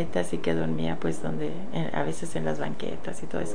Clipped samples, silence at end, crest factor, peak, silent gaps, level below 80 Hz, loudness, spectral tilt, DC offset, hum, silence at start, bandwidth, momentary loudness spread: under 0.1%; 0 s; 18 dB; -12 dBFS; none; -54 dBFS; -31 LUFS; -6 dB/octave; 6%; none; 0 s; 10 kHz; 6 LU